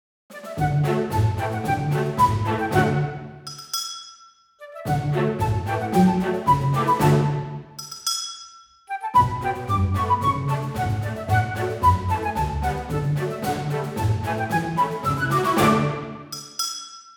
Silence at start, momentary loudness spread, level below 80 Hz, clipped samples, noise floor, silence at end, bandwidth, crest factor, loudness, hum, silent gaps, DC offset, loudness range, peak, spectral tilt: 0.3 s; 14 LU; -42 dBFS; under 0.1%; -51 dBFS; 0.05 s; 20 kHz; 18 dB; -23 LUFS; none; none; under 0.1%; 3 LU; -4 dBFS; -5.5 dB/octave